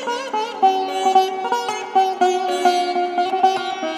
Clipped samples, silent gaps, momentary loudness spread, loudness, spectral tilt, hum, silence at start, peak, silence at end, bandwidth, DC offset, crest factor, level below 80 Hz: under 0.1%; none; 6 LU; -19 LUFS; -2 dB/octave; none; 0 s; -2 dBFS; 0 s; 14 kHz; under 0.1%; 16 dB; -80 dBFS